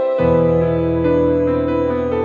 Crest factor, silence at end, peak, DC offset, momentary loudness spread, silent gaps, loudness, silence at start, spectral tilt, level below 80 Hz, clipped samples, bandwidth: 12 dB; 0 s; -4 dBFS; under 0.1%; 4 LU; none; -16 LUFS; 0 s; -10 dB/octave; -36 dBFS; under 0.1%; 4.6 kHz